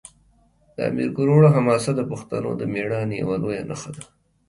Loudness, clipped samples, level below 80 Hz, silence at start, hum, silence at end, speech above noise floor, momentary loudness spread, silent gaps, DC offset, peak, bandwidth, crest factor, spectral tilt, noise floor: -21 LUFS; under 0.1%; -56 dBFS; 0.8 s; none; 0.45 s; 38 dB; 17 LU; none; under 0.1%; -4 dBFS; 11.5 kHz; 18 dB; -7.5 dB/octave; -59 dBFS